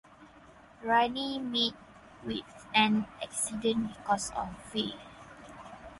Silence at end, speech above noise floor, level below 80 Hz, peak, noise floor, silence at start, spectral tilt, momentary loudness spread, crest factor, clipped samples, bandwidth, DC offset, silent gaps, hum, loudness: 0 s; 24 dB; -60 dBFS; -10 dBFS; -55 dBFS; 0.2 s; -3 dB/octave; 21 LU; 22 dB; under 0.1%; 11.5 kHz; under 0.1%; none; none; -31 LUFS